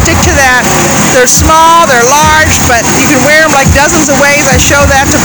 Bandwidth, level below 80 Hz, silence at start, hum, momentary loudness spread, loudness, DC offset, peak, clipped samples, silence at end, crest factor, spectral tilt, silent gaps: over 20 kHz; -20 dBFS; 0 s; none; 2 LU; -4 LUFS; 0.7%; 0 dBFS; 7%; 0 s; 6 dB; -3 dB/octave; none